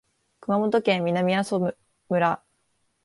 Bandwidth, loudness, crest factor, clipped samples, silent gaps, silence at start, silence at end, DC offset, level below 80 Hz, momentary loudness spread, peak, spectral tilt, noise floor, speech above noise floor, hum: 11.5 kHz; -24 LUFS; 16 dB; under 0.1%; none; 0.5 s; 0.7 s; under 0.1%; -68 dBFS; 8 LU; -8 dBFS; -6.5 dB/octave; -71 dBFS; 48 dB; none